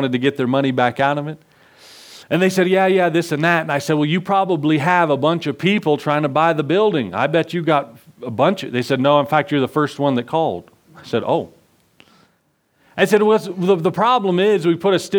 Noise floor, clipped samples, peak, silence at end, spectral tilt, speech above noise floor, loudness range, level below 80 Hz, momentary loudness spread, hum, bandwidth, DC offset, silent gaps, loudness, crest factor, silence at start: -63 dBFS; under 0.1%; 0 dBFS; 0 s; -6 dB/octave; 46 dB; 4 LU; -66 dBFS; 7 LU; none; 20 kHz; under 0.1%; none; -17 LUFS; 18 dB; 0 s